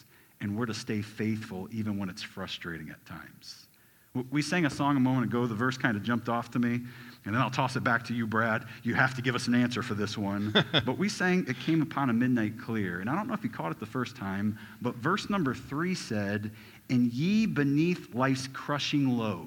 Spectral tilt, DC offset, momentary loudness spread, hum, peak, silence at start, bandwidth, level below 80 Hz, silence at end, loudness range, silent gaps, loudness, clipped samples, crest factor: -5.5 dB/octave; under 0.1%; 11 LU; none; -8 dBFS; 0.4 s; 18.5 kHz; -64 dBFS; 0 s; 7 LU; none; -30 LUFS; under 0.1%; 22 dB